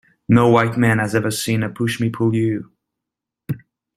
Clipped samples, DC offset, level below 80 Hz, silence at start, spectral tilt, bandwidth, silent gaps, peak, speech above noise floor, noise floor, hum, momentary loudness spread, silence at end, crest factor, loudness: under 0.1%; under 0.1%; -52 dBFS; 0.3 s; -6 dB/octave; 15 kHz; none; -2 dBFS; 67 dB; -84 dBFS; none; 16 LU; 0.4 s; 18 dB; -18 LUFS